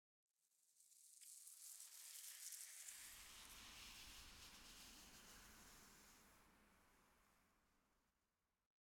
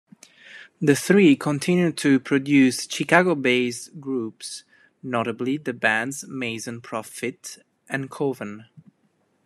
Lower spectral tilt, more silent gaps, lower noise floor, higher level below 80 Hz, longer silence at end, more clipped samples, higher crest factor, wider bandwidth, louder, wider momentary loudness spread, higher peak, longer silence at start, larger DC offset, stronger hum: second, 0 dB/octave vs -5 dB/octave; neither; first, under -90 dBFS vs -67 dBFS; second, -78 dBFS vs -70 dBFS; first, 0.8 s vs 0.65 s; neither; first, 30 dB vs 22 dB; first, 18 kHz vs 14 kHz; second, -59 LUFS vs -22 LUFS; second, 12 LU vs 17 LU; second, -34 dBFS vs 0 dBFS; about the same, 0.4 s vs 0.5 s; neither; neither